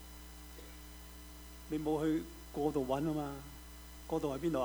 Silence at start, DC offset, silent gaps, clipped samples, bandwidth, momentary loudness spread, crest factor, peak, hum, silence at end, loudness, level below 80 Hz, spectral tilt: 0 s; under 0.1%; none; under 0.1%; over 20 kHz; 17 LU; 18 dB; -20 dBFS; none; 0 s; -37 LUFS; -54 dBFS; -6.5 dB/octave